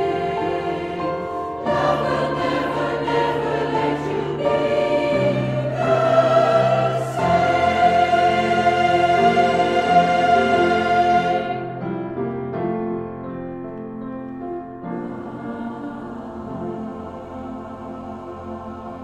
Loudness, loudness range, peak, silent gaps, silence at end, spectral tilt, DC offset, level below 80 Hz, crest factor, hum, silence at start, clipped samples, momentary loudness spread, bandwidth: -20 LUFS; 14 LU; -4 dBFS; none; 0 s; -6.5 dB/octave; under 0.1%; -50 dBFS; 18 dB; none; 0 s; under 0.1%; 16 LU; 11 kHz